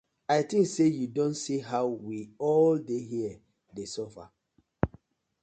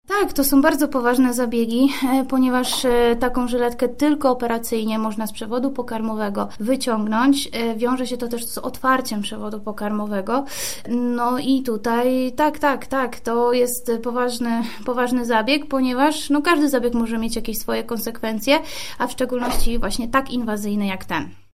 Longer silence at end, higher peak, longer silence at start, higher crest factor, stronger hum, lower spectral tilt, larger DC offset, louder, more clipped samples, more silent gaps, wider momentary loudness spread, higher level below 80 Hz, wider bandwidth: first, 0.55 s vs 0 s; second, -8 dBFS vs -2 dBFS; first, 0.3 s vs 0 s; about the same, 22 dB vs 18 dB; neither; first, -6 dB/octave vs -4 dB/octave; second, under 0.1% vs 2%; second, -29 LUFS vs -21 LUFS; neither; neither; first, 14 LU vs 8 LU; second, -56 dBFS vs -36 dBFS; second, 9.2 kHz vs 16 kHz